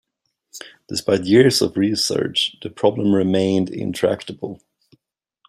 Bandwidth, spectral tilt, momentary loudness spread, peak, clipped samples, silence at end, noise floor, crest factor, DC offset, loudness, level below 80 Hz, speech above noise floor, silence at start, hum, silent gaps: 15 kHz; -5 dB/octave; 18 LU; -2 dBFS; under 0.1%; 0.95 s; -73 dBFS; 18 dB; under 0.1%; -19 LUFS; -60 dBFS; 54 dB; 0.55 s; none; none